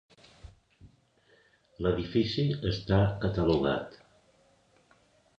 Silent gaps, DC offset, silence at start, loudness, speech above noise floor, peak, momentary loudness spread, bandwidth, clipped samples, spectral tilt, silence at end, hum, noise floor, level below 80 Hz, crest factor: none; under 0.1%; 0.45 s; -29 LUFS; 37 dB; -12 dBFS; 6 LU; 7.6 kHz; under 0.1%; -8 dB/octave; 1.45 s; none; -65 dBFS; -48 dBFS; 20 dB